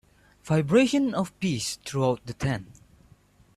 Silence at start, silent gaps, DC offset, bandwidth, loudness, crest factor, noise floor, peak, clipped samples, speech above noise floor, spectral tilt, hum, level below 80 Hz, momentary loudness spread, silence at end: 0.45 s; none; under 0.1%; 13.5 kHz; -26 LUFS; 18 dB; -58 dBFS; -8 dBFS; under 0.1%; 33 dB; -5.5 dB/octave; none; -54 dBFS; 9 LU; 0.9 s